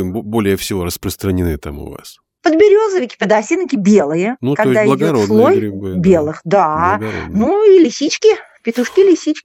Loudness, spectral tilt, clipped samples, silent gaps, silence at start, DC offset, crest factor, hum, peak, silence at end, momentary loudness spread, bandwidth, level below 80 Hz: -13 LUFS; -6 dB/octave; under 0.1%; none; 0 s; under 0.1%; 14 dB; none; 0 dBFS; 0.05 s; 10 LU; 17.5 kHz; -42 dBFS